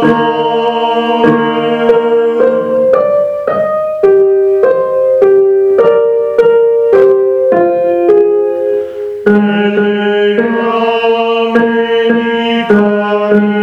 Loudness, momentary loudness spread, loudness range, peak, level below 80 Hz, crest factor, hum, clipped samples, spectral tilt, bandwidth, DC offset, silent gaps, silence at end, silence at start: -10 LUFS; 4 LU; 2 LU; 0 dBFS; -52 dBFS; 10 dB; none; 0.2%; -7.5 dB/octave; 5.8 kHz; under 0.1%; none; 0 s; 0 s